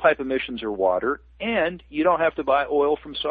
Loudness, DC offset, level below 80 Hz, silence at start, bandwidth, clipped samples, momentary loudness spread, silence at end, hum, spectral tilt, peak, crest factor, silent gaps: -23 LUFS; under 0.1%; -50 dBFS; 0 s; 4.9 kHz; under 0.1%; 6 LU; 0 s; none; -8.5 dB/octave; -4 dBFS; 18 dB; none